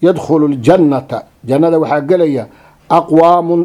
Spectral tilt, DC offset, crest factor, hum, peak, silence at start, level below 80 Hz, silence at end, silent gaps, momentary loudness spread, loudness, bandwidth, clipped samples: -8 dB/octave; under 0.1%; 12 dB; none; 0 dBFS; 0 s; -50 dBFS; 0 s; none; 10 LU; -11 LUFS; 11.5 kHz; 0.3%